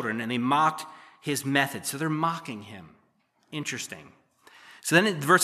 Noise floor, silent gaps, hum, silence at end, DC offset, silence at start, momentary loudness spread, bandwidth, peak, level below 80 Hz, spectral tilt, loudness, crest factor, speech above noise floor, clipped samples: -68 dBFS; none; none; 0 s; under 0.1%; 0 s; 18 LU; 15 kHz; -4 dBFS; -78 dBFS; -4 dB/octave; -26 LUFS; 24 dB; 42 dB; under 0.1%